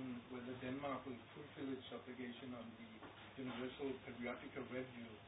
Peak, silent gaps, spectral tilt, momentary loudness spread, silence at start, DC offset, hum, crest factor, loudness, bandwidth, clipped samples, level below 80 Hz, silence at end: -34 dBFS; none; -3.5 dB/octave; 9 LU; 0 s; under 0.1%; none; 16 dB; -50 LUFS; 3.9 kHz; under 0.1%; -74 dBFS; 0 s